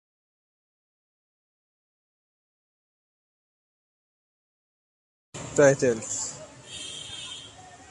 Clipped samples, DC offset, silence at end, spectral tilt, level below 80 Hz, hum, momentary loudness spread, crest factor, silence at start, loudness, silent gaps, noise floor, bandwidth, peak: under 0.1%; under 0.1%; 0 s; -3.5 dB/octave; -64 dBFS; none; 22 LU; 26 dB; 5.35 s; -26 LUFS; none; -47 dBFS; 11.5 kHz; -6 dBFS